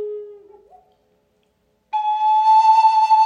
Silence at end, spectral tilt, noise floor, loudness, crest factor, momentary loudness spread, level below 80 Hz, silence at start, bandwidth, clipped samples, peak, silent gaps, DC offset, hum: 0 s; -0.5 dB/octave; -65 dBFS; -15 LUFS; 12 dB; 17 LU; -74 dBFS; 0 s; 7.6 kHz; under 0.1%; -6 dBFS; none; under 0.1%; none